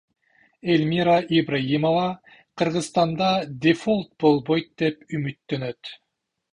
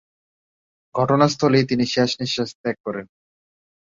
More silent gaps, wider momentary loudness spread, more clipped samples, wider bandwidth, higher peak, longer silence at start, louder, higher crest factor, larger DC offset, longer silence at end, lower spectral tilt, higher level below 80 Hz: second, none vs 2.55-2.64 s, 2.80-2.84 s; second, 10 LU vs 13 LU; neither; first, 11 kHz vs 7.6 kHz; about the same, -4 dBFS vs -4 dBFS; second, 0.65 s vs 0.95 s; second, -23 LUFS vs -20 LUFS; about the same, 18 dB vs 20 dB; neither; second, 0.6 s vs 0.95 s; about the same, -6 dB/octave vs -5.5 dB/octave; about the same, -60 dBFS vs -60 dBFS